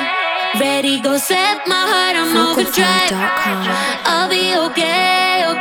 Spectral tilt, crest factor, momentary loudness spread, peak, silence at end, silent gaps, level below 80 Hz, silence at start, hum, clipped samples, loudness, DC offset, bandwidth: -2.5 dB/octave; 14 dB; 4 LU; 0 dBFS; 0 s; none; -58 dBFS; 0 s; none; under 0.1%; -14 LUFS; under 0.1%; over 20 kHz